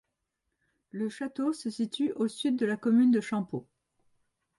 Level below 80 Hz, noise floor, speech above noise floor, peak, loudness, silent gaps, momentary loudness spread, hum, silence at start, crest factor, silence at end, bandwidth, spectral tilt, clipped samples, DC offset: -78 dBFS; -83 dBFS; 54 dB; -16 dBFS; -29 LUFS; none; 12 LU; none; 0.95 s; 14 dB; 0.95 s; 11.5 kHz; -5.5 dB/octave; under 0.1%; under 0.1%